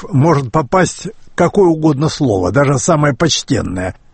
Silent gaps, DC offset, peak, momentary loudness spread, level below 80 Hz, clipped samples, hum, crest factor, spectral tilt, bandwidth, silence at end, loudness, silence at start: none; under 0.1%; 0 dBFS; 7 LU; -38 dBFS; under 0.1%; none; 14 dB; -5.5 dB/octave; 8.8 kHz; 0.2 s; -13 LUFS; 0 s